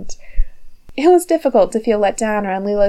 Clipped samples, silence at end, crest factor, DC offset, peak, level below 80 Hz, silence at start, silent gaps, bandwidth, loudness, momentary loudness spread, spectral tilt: under 0.1%; 0 s; 14 dB; under 0.1%; -2 dBFS; -28 dBFS; 0 s; none; 13 kHz; -16 LUFS; 17 LU; -5 dB/octave